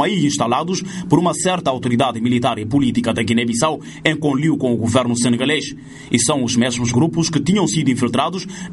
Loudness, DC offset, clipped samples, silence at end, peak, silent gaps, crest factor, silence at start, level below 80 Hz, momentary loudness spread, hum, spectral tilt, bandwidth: -18 LUFS; under 0.1%; under 0.1%; 0 s; 0 dBFS; none; 16 dB; 0 s; -48 dBFS; 4 LU; none; -4.5 dB/octave; 11.5 kHz